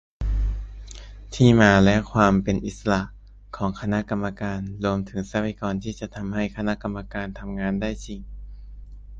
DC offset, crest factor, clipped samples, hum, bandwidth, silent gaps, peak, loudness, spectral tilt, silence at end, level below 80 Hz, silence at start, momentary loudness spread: under 0.1%; 24 dB; under 0.1%; none; 8 kHz; none; 0 dBFS; -23 LUFS; -6.5 dB/octave; 0 s; -34 dBFS; 0.2 s; 21 LU